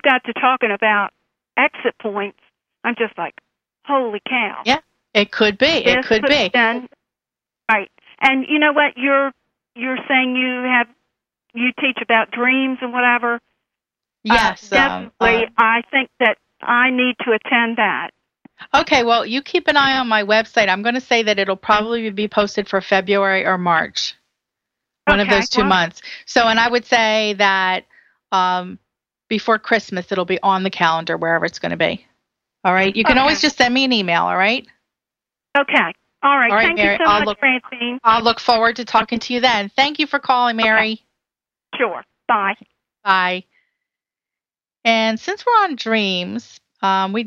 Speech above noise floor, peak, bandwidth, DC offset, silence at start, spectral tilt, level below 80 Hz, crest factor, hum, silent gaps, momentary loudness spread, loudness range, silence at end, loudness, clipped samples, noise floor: over 73 dB; 0 dBFS; 10 kHz; under 0.1%; 0.05 s; -4 dB/octave; -48 dBFS; 18 dB; none; none; 9 LU; 4 LU; 0 s; -17 LUFS; under 0.1%; under -90 dBFS